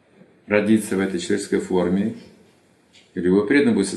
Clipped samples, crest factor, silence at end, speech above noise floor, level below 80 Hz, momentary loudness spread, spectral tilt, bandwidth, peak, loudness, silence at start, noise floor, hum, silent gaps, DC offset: under 0.1%; 18 dB; 0 s; 37 dB; -64 dBFS; 9 LU; -6 dB/octave; 12.5 kHz; -2 dBFS; -20 LUFS; 0.5 s; -56 dBFS; none; none; under 0.1%